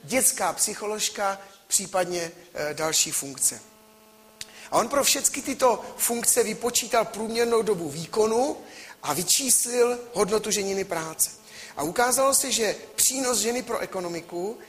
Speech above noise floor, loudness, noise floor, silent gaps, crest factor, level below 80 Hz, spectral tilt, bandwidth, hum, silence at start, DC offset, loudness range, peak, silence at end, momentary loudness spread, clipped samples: 28 dB; -24 LUFS; -54 dBFS; none; 20 dB; -62 dBFS; -1.5 dB/octave; 15.5 kHz; none; 0.05 s; under 0.1%; 3 LU; -6 dBFS; 0 s; 12 LU; under 0.1%